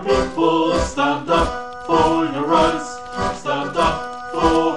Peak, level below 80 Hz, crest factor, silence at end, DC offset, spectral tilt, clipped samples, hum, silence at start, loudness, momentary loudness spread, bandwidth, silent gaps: -2 dBFS; -34 dBFS; 16 dB; 0 s; 0.9%; -5 dB/octave; under 0.1%; none; 0 s; -19 LUFS; 9 LU; 10.5 kHz; none